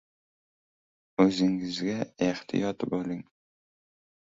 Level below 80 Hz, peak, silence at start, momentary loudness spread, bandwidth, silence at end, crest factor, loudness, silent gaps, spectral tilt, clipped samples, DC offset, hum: -66 dBFS; -10 dBFS; 1.2 s; 11 LU; 7.8 kHz; 1 s; 22 dB; -29 LUFS; none; -6 dB/octave; under 0.1%; under 0.1%; none